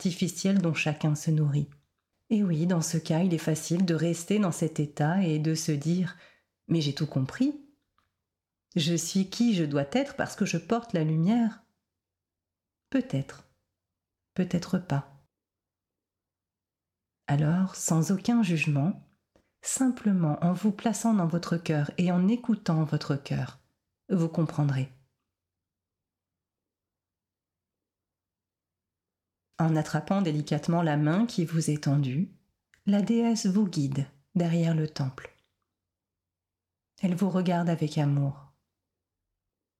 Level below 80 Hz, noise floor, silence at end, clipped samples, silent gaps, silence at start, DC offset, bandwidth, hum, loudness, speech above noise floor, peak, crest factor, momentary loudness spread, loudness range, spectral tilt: -68 dBFS; under -90 dBFS; 1.35 s; under 0.1%; none; 0 s; under 0.1%; 15 kHz; none; -28 LUFS; over 63 dB; -16 dBFS; 14 dB; 7 LU; 7 LU; -6 dB/octave